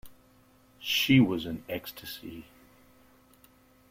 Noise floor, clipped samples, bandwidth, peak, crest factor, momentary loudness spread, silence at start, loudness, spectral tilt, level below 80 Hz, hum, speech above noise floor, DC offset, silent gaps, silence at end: -61 dBFS; under 0.1%; 16.5 kHz; -12 dBFS; 20 dB; 20 LU; 0.05 s; -28 LUFS; -5 dB/octave; -62 dBFS; none; 33 dB; under 0.1%; none; 1.5 s